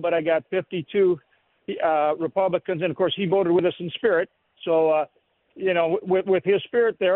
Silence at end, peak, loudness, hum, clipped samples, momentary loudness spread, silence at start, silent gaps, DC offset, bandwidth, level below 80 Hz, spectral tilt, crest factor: 0 s; -8 dBFS; -23 LUFS; none; under 0.1%; 8 LU; 0 s; none; under 0.1%; 4.1 kHz; -66 dBFS; -10.5 dB/octave; 14 dB